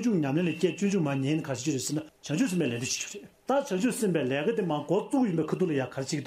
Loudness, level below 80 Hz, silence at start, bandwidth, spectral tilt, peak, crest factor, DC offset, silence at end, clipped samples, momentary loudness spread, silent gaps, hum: -29 LUFS; -70 dBFS; 0 s; 15.5 kHz; -5.5 dB/octave; -12 dBFS; 16 dB; under 0.1%; 0 s; under 0.1%; 5 LU; none; none